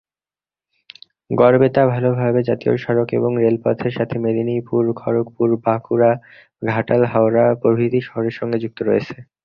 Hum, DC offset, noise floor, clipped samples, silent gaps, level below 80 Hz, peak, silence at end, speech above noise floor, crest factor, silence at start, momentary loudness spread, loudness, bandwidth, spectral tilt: none; under 0.1%; under -90 dBFS; under 0.1%; none; -56 dBFS; -2 dBFS; 0.2 s; over 73 dB; 16 dB; 1.3 s; 8 LU; -18 LUFS; 5.8 kHz; -10 dB/octave